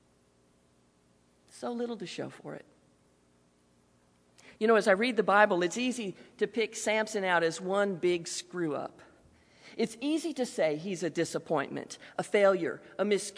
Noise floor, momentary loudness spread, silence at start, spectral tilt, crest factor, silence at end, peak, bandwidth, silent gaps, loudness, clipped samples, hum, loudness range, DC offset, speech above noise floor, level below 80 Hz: -67 dBFS; 15 LU; 1.55 s; -4 dB/octave; 24 dB; 0 s; -8 dBFS; 11 kHz; none; -30 LUFS; under 0.1%; 60 Hz at -65 dBFS; 14 LU; under 0.1%; 37 dB; -76 dBFS